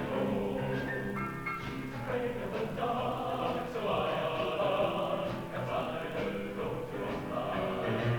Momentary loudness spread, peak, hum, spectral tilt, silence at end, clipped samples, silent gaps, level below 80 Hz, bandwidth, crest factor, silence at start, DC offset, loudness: 5 LU; -18 dBFS; none; -6.5 dB/octave; 0 s; under 0.1%; none; -54 dBFS; 19.5 kHz; 14 dB; 0 s; under 0.1%; -34 LUFS